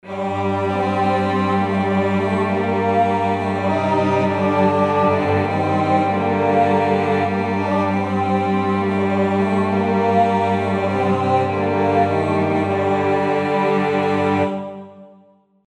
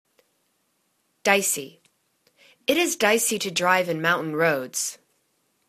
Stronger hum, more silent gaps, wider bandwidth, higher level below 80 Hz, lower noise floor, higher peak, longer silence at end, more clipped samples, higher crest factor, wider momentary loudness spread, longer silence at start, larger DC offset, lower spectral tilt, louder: neither; neither; second, 9.4 kHz vs 14 kHz; first, -60 dBFS vs -72 dBFS; second, -53 dBFS vs -71 dBFS; about the same, -4 dBFS vs -2 dBFS; second, 0.6 s vs 0.75 s; neither; second, 14 dB vs 24 dB; second, 3 LU vs 9 LU; second, 0.05 s vs 1.25 s; neither; first, -7.5 dB/octave vs -2.5 dB/octave; first, -18 LUFS vs -22 LUFS